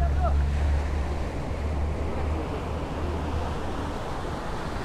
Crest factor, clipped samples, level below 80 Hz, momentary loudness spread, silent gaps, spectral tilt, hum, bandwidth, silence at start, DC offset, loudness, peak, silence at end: 12 dB; under 0.1%; -30 dBFS; 7 LU; none; -7 dB/octave; none; 10.5 kHz; 0 s; under 0.1%; -30 LUFS; -14 dBFS; 0 s